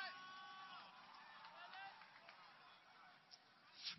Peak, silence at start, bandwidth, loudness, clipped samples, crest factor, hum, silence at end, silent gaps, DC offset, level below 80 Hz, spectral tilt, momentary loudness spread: -36 dBFS; 0 s; 5.8 kHz; -59 LUFS; under 0.1%; 22 dB; none; 0 s; none; under 0.1%; under -90 dBFS; 2 dB/octave; 10 LU